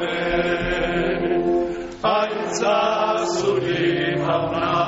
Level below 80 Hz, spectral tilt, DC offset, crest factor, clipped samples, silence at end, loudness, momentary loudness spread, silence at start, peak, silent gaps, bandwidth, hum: -42 dBFS; -3.5 dB/octave; under 0.1%; 12 dB; under 0.1%; 0 s; -21 LUFS; 3 LU; 0 s; -8 dBFS; none; 8 kHz; none